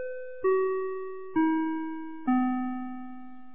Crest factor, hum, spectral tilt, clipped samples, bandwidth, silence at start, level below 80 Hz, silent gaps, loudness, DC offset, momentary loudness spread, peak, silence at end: 14 dB; none; -5 dB/octave; under 0.1%; 3.6 kHz; 0 s; -70 dBFS; none; -30 LUFS; 0.9%; 13 LU; -16 dBFS; 0 s